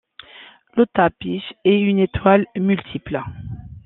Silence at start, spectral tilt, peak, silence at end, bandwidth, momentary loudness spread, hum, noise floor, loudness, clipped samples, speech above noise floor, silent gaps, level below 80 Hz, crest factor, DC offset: 0.4 s; -10.5 dB/octave; -2 dBFS; 0.05 s; 4.1 kHz; 16 LU; none; -45 dBFS; -19 LUFS; under 0.1%; 27 dB; none; -46 dBFS; 18 dB; under 0.1%